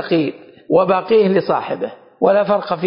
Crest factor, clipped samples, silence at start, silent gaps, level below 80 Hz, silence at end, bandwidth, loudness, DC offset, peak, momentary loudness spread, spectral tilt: 14 dB; under 0.1%; 0 s; none; -62 dBFS; 0 s; 5.4 kHz; -16 LUFS; under 0.1%; -2 dBFS; 11 LU; -11.5 dB/octave